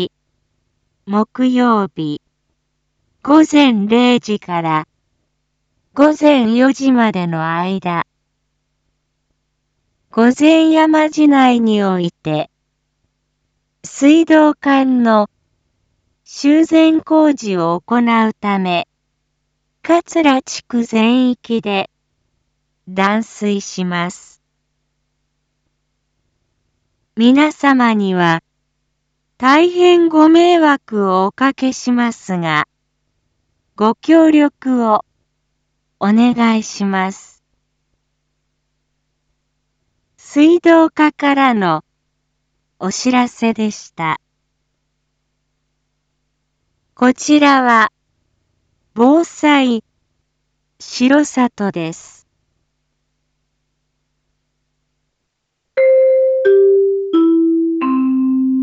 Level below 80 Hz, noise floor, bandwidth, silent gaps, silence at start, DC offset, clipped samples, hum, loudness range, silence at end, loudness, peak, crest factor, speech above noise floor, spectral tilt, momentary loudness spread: -62 dBFS; -72 dBFS; 8 kHz; none; 0 s; under 0.1%; under 0.1%; none; 9 LU; 0 s; -13 LUFS; 0 dBFS; 16 dB; 60 dB; -5.5 dB/octave; 11 LU